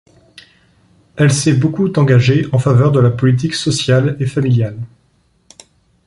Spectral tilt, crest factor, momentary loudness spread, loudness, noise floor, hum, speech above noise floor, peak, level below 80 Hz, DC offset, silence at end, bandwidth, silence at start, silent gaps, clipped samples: -6 dB/octave; 14 dB; 6 LU; -13 LUFS; -57 dBFS; none; 45 dB; 0 dBFS; -46 dBFS; under 0.1%; 1.2 s; 11.5 kHz; 1.15 s; none; under 0.1%